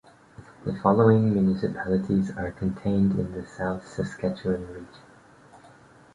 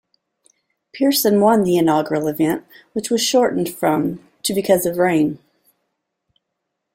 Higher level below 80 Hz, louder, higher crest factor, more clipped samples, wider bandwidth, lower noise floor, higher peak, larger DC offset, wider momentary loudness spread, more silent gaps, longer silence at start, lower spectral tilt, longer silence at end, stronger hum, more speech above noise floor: first, -50 dBFS vs -60 dBFS; second, -25 LUFS vs -18 LUFS; about the same, 20 dB vs 18 dB; neither; second, 10 kHz vs 16.5 kHz; second, -52 dBFS vs -77 dBFS; second, -6 dBFS vs -2 dBFS; neither; first, 14 LU vs 11 LU; neither; second, 0.4 s vs 0.95 s; first, -9 dB/octave vs -4.5 dB/octave; second, 1.15 s vs 1.6 s; neither; second, 28 dB vs 60 dB